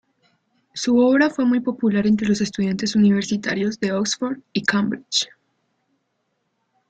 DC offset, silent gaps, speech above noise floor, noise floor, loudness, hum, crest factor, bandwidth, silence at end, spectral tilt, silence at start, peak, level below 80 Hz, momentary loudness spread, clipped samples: under 0.1%; none; 53 dB; -72 dBFS; -20 LUFS; none; 16 dB; 9 kHz; 1.65 s; -4.5 dB/octave; 0.75 s; -4 dBFS; -60 dBFS; 7 LU; under 0.1%